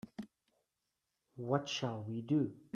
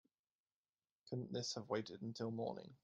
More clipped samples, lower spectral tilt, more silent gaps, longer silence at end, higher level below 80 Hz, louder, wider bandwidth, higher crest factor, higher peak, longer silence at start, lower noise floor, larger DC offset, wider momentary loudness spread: neither; about the same, -6 dB/octave vs -5 dB/octave; neither; about the same, 0.15 s vs 0.1 s; first, -78 dBFS vs -84 dBFS; first, -37 LUFS vs -46 LUFS; about the same, 9.4 kHz vs 9.4 kHz; about the same, 22 dB vs 22 dB; first, -18 dBFS vs -26 dBFS; second, 0.05 s vs 1.05 s; about the same, -87 dBFS vs under -90 dBFS; neither; first, 16 LU vs 5 LU